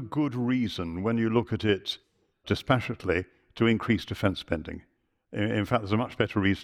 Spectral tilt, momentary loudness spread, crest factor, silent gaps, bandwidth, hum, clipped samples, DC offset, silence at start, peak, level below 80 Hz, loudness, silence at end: -7 dB/octave; 10 LU; 20 dB; none; 14.5 kHz; none; under 0.1%; under 0.1%; 0 s; -8 dBFS; -52 dBFS; -28 LUFS; 0 s